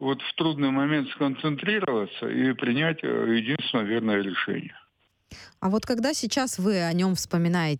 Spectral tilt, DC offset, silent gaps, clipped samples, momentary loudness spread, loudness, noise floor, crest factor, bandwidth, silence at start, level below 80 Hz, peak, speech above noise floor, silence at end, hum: -5 dB/octave; under 0.1%; none; under 0.1%; 4 LU; -26 LUFS; -65 dBFS; 14 dB; 17.5 kHz; 0 s; -62 dBFS; -12 dBFS; 40 dB; 0 s; none